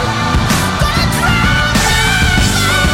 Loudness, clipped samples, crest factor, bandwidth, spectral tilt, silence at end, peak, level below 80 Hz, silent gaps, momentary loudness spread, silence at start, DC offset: -12 LUFS; under 0.1%; 12 dB; 16.5 kHz; -3.5 dB/octave; 0 s; 0 dBFS; -20 dBFS; none; 3 LU; 0 s; under 0.1%